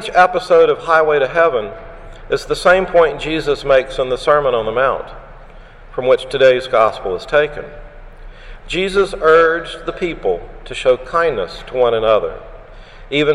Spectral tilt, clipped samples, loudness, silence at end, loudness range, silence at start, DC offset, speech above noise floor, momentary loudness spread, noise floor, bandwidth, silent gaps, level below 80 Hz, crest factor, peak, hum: -4.5 dB/octave; under 0.1%; -15 LUFS; 0 s; 3 LU; 0 s; under 0.1%; 23 dB; 13 LU; -37 dBFS; 11.5 kHz; none; -36 dBFS; 16 dB; 0 dBFS; none